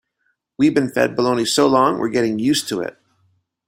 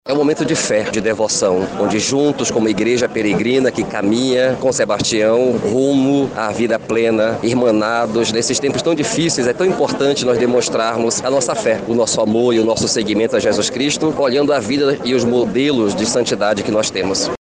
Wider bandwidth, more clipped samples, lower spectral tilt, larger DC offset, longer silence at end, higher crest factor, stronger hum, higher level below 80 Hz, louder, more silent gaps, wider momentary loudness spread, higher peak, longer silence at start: first, 16 kHz vs 10 kHz; neither; about the same, -4.5 dB/octave vs -4 dB/octave; neither; first, 0.75 s vs 0.05 s; first, 18 dB vs 12 dB; neither; second, -60 dBFS vs -50 dBFS; about the same, -18 LUFS vs -16 LUFS; neither; first, 8 LU vs 3 LU; about the same, -2 dBFS vs -4 dBFS; first, 0.6 s vs 0.05 s